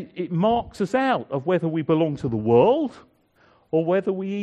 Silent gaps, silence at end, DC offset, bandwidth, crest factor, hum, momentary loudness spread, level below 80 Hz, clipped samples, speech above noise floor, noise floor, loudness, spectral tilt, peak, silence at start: none; 0 s; under 0.1%; 9.2 kHz; 18 dB; none; 8 LU; -54 dBFS; under 0.1%; 37 dB; -59 dBFS; -22 LUFS; -8 dB/octave; -4 dBFS; 0 s